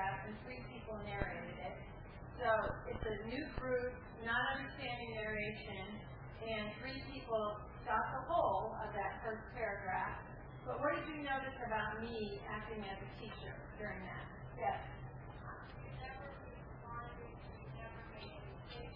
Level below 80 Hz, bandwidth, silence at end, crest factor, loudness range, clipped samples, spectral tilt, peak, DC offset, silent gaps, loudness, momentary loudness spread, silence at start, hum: -56 dBFS; 4.9 kHz; 0 s; 22 dB; 7 LU; under 0.1%; -3.5 dB/octave; -22 dBFS; under 0.1%; none; -43 LUFS; 14 LU; 0 s; none